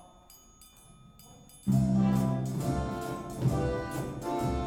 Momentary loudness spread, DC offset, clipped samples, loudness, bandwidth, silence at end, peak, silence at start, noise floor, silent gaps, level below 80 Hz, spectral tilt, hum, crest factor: 10 LU; under 0.1%; under 0.1%; -31 LUFS; 16.5 kHz; 0 s; -16 dBFS; 0 s; -56 dBFS; none; -46 dBFS; -7.5 dB/octave; none; 16 dB